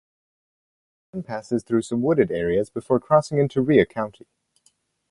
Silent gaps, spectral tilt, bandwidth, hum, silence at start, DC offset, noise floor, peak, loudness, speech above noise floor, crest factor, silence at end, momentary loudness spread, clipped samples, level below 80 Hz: none; -7 dB/octave; 11.5 kHz; none; 1.15 s; under 0.1%; -65 dBFS; -2 dBFS; -22 LUFS; 44 dB; 22 dB; 1 s; 13 LU; under 0.1%; -54 dBFS